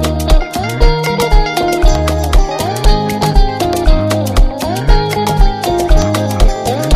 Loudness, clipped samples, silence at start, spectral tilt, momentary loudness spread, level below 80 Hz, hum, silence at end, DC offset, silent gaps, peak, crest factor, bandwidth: -14 LUFS; 0.2%; 0 s; -5.5 dB/octave; 2 LU; -12 dBFS; none; 0 s; under 0.1%; none; 0 dBFS; 10 dB; 15.5 kHz